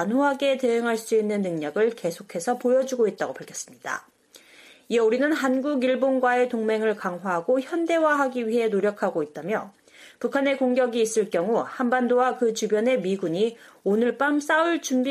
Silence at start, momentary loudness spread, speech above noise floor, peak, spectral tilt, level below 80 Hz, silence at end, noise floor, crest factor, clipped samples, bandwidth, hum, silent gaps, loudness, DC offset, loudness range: 0 s; 9 LU; 29 dB; -10 dBFS; -4.5 dB/octave; -74 dBFS; 0 s; -52 dBFS; 14 dB; under 0.1%; 15 kHz; none; none; -24 LUFS; under 0.1%; 3 LU